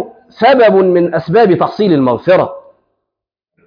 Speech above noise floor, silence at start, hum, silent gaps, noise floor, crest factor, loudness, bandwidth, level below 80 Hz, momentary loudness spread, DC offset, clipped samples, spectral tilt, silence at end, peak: 70 dB; 0 s; none; none; -80 dBFS; 12 dB; -10 LUFS; 5.2 kHz; -54 dBFS; 5 LU; under 0.1%; under 0.1%; -8.5 dB/octave; 1.05 s; 0 dBFS